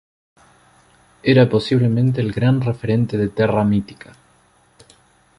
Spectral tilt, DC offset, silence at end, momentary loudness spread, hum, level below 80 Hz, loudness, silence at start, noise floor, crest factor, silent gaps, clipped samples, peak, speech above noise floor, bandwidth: -8.5 dB/octave; under 0.1%; 1.45 s; 6 LU; none; -48 dBFS; -18 LUFS; 1.25 s; -56 dBFS; 16 dB; none; under 0.1%; -2 dBFS; 39 dB; 11 kHz